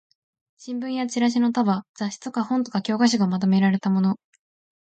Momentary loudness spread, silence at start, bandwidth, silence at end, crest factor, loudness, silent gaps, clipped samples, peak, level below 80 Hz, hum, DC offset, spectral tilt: 11 LU; 0.6 s; 8.8 kHz; 0.7 s; 16 dB; -23 LUFS; 1.89-1.94 s; under 0.1%; -8 dBFS; -70 dBFS; none; under 0.1%; -6 dB/octave